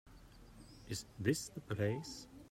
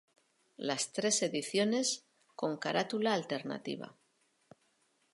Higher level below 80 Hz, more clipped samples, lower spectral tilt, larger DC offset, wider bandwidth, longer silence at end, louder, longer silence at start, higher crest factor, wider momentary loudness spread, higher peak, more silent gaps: first, -64 dBFS vs -86 dBFS; neither; first, -5 dB/octave vs -3 dB/octave; neither; first, 16 kHz vs 11.5 kHz; second, 0.05 s vs 1.2 s; second, -41 LUFS vs -34 LUFS; second, 0.05 s vs 0.6 s; about the same, 22 dB vs 20 dB; first, 23 LU vs 11 LU; second, -20 dBFS vs -16 dBFS; neither